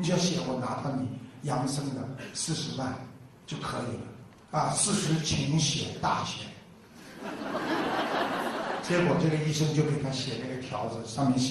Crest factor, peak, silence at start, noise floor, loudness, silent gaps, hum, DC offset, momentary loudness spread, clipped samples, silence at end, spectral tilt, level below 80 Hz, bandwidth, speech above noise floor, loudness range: 18 dB; -12 dBFS; 0 s; -51 dBFS; -30 LUFS; none; none; under 0.1%; 15 LU; under 0.1%; 0 s; -4.5 dB/octave; -58 dBFS; 13 kHz; 21 dB; 5 LU